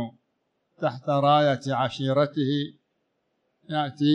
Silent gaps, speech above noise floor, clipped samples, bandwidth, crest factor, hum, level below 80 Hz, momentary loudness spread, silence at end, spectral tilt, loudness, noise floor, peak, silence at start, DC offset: none; 52 dB; under 0.1%; 9 kHz; 18 dB; none; -72 dBFS; 11 LU; 0 s; -7 dB/octave; -25 LUFS; -75 dBFS; -8 dBFS; 0 s; under 0.1%